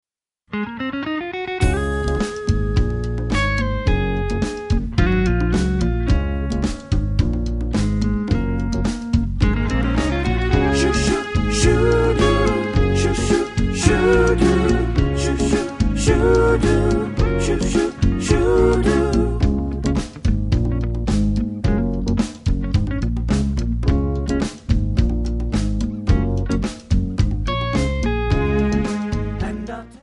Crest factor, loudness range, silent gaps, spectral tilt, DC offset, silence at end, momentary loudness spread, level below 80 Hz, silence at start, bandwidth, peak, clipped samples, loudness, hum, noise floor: 18 dB; 4 LU; none; -6.5 dB/octave; under 0.1%; 0.1 s; 7 LU; -24 dBFS; 0.5 s; 11.5 kHz; -2 dBFS; under 0.1%; -20 LUFS; none; -56 dBFS